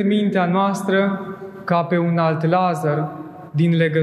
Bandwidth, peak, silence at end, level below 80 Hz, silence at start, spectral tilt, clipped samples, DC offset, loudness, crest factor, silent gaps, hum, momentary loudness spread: 12.5 kHz; -4 dBFS; 0 s; -66 dBFS; 0 s; -7.5 dB/octave; under 0.1%; under 0.1%; -19 LUFS; 14 dB; none; none; 11 LU